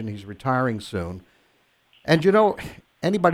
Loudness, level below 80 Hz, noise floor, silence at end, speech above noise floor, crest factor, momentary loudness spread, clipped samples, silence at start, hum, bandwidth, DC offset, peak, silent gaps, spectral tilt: -22 LUFS; -54 dBFS; -63 dBFS; 0 s; 42 dB; 20 dB; 17 LU; under 0.1%; 0 s; none; 15 kHz; under 0.1%; -4 dBFS; none; -6.5 dB/octave